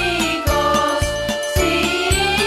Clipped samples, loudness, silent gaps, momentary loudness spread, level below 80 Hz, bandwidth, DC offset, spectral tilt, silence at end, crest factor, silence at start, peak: under 0.1%; -18 LUFS; none; 4 LU; -28 dBFS; 16 kHz; under 0.1%; -3.5 dB/octave; 0 s; 14 dB; 0 s; -4 dBFS